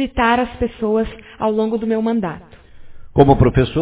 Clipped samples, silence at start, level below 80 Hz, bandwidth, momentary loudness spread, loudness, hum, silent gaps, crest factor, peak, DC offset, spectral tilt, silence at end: under 0.1%; 0 s; -32 dBFS; 4 kHz; 10 LU; -17 LUFS; none; none; 18 dB; 0 dBFS; under 0.1%; -11.5 dB/octave; 0 s